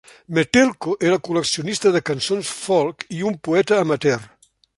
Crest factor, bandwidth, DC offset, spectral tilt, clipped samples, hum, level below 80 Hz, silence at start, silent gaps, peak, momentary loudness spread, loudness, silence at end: 18 dB; 11.5 kHz; under 0.1%; -4.5 dB/octave; under 0.1%; none; -56 dBFS; 0.3 s; none; -2 dBFS; 8 LU; -20 LUFS; 0.5 s